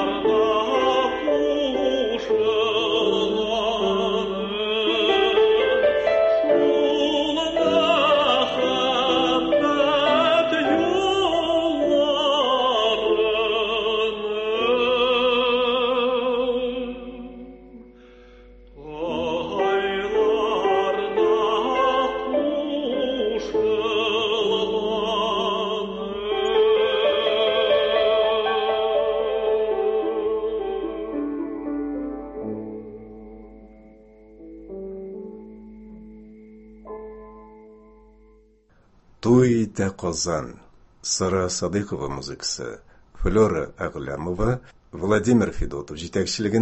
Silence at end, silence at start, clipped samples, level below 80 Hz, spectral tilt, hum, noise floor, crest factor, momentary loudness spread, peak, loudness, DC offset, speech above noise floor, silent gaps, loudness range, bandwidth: 0 s; 0 s; under 0.1%; -46 dBFS; -4.5 dB/octave; none; -57 dBFS; 16 dB; 13 LU; -6 dBFS; -22 LUFS; under 0.1%; 34 dB; none; 12 LU; 8.4 kHz